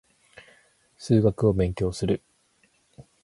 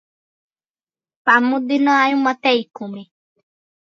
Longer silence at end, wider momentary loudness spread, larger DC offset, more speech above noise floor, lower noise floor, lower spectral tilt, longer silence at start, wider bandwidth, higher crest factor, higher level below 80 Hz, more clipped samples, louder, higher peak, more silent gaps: second, 0.25 s vs 0.75 s; second, 8 LU vs 17 LU; neither; second, 43 dB vs over 73 dB; second, -65 dBFS vs under -90 dBFS; first, -7.5 dB/octave vs -4.5 dB/octave; second, 1 s vs 1.25 s; first, 11.5 kHz vs 7.4 kHz; about the same, 20 dB vs 20 dB; first, -44 dBFS vs -78 dBFS; neither; second, -24 LUFS vs -16 LUFS; second, -8 dBFS vs 0 dBFS; neither